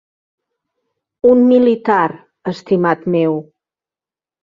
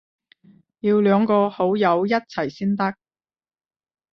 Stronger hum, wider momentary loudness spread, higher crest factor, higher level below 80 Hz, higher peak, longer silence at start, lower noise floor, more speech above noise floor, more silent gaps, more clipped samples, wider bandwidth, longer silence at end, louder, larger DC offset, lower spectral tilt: neither; first, 15 LU vs 9 LU; about the same, 14 dB vs 18 dB; first, -58 dBFS vs -66 dBFS; about the same, -2 dBFS vs -4 dBFS; first, 1.25 s vs 0.85 s; first, under -90 dBFS vs -55 dBFS; first, over 77 dB vs 36 dB; neither; neither; first, 7.2 kHz vs 6.2 kHz; second, 1 s vs 1.2 s; first, -14 LUFS vs -20 LUFS; neither; about the same, -8.5 dB/octave vs -8 dB/octave